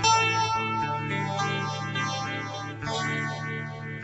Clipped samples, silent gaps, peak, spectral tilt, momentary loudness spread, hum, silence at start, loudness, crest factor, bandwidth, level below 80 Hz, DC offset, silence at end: under 0.1%; none; -10 dBFS; -3.5 dB/octave; 10 LU; none; 0 s; -28 LUFS; 18 dB; 8.2 kHz; -58 dBFS; under 0.1%; 0 s